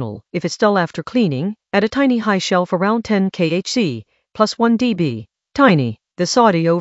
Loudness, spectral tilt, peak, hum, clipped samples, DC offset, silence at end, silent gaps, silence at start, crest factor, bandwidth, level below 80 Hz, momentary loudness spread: -17 LUFS; -5.5 dB/octave; 0 dBFS; none; under 0.1%; under 0.1%; 0 s; none; 0 s; 16 dB; 8.2 kHz; -56 dBFS; 10 LU